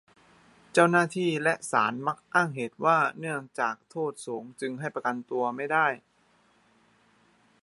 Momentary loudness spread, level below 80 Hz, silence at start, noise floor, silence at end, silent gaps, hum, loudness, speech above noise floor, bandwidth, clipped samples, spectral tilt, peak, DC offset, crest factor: 11 LU; -78 dBFS; 0.75 s; -65 dBFS; 1.65 s; none; none; -27 LUFS; 38 dB; 11.5 kHz; under 0.1%; -5 dB/octave; -4 dBFS; under 0.1%; 24 dB